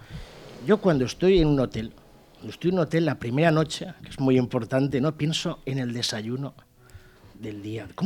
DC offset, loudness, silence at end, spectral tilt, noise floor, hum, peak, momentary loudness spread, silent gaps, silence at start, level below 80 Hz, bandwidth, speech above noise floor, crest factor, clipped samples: under 0.1%; -25 LUFS; 0 s; -6 dB/octave; -50 dBFS; none; -6 dBFS; 18 LU; none; 0 s; -44 dBFS; 15.5 kHz; 26 dB; 18 dB; under 0.1%